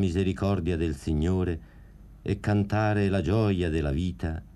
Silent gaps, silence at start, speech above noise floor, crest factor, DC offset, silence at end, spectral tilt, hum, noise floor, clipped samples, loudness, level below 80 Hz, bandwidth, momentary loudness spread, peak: none; 0 s; 22 dB; 14 dB; under 0.1%; 0.1 s; -8 dB/octave; none; -48 dBFS; under 0.1%; -27 LUFS; -40 dBFS; 11 kHz; 7 LU; -12 dBFS